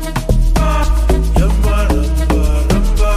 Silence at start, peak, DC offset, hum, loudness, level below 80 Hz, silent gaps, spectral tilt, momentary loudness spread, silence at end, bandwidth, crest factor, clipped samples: 0 s; 0 dBFS; under 0.1%; none; -15 LUFS; -12 dBFS; none; -6 dB/octave; 1 LU; 0 s; 15 kHz; 12 dB; under 0.1%